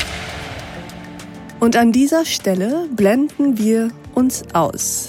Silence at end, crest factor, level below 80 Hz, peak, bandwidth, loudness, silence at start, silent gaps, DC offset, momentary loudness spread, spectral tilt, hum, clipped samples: 0 s; 14 dB; -44 dBFS; -4 dBFS; 17 kHz; -17 LUFS; 0 s; none; under 0.1%; 19 LU; -4.5 dB/octave; none; under 0.1%